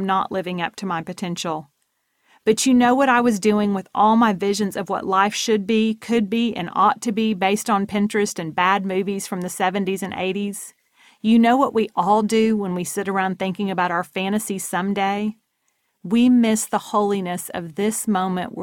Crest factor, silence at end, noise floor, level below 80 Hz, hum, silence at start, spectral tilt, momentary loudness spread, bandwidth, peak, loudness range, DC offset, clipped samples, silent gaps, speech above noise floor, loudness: 16 dB; 0 s; -70 dBFS; -62 dBFS; none; 0 s; -4.5 dB/octave; 11 LU; 17 kHz; -4 dBFS; 4 LU; under 0.1%; under 0.1%; none; 51 dB; -20 LUFS